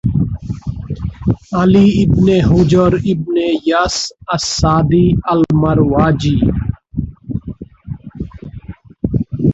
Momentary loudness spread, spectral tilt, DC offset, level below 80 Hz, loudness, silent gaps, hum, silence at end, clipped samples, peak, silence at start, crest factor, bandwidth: 18 LU; -6.5 dB/octave; under 0.1%; -30 dBFS; -14 LUFS; none; none; 0 s; under 0.1%; 0 dBFS; 0.05 s; 14 dB; 8 kHz